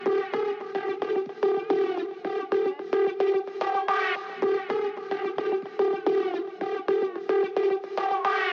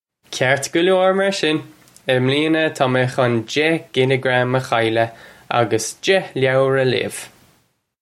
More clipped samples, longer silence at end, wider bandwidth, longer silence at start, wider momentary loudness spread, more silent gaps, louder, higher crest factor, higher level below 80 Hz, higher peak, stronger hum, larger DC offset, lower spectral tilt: neither; second, 0 s vs 0.75 s; second, 6.4 kHz vs 15 kHz; second, 0 s vs 0.3 s; about the same, 6 LU vs 6 LU; neither; second, -27 LUFS vs -18 LUFS; about the same, 14 dB vs 18 dB; second, -88 dBFS vs -62 dBFS; second, -12 dBFS vs 0 dBFS; neither; neither; about the same, -5.5 dB/octave vs -5 dB/octave